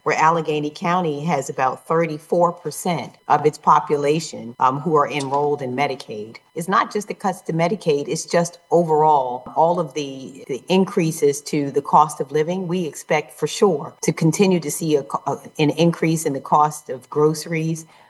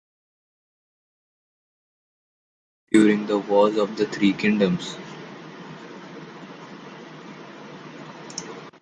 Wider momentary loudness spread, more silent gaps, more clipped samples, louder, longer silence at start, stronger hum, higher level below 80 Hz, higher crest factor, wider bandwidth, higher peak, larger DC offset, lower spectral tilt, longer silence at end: second, 9 LU vs 21 LU; neither; neither; about the same, -20 LUFS vs -21 LUFS; second, 0.05 s vs 2.9 s; neither; about the same, -68 dBFS vs -66 dBFS; about the same, 18 dB vs 22 dB; first, 12.5 kHz vs 10.5 kHz; about the same, -2 dBFS vs -4 dBFS; neither; about the same, -5.5 dB/octave vs -6 dB/octave; first, 0.25 s vs 0.1 s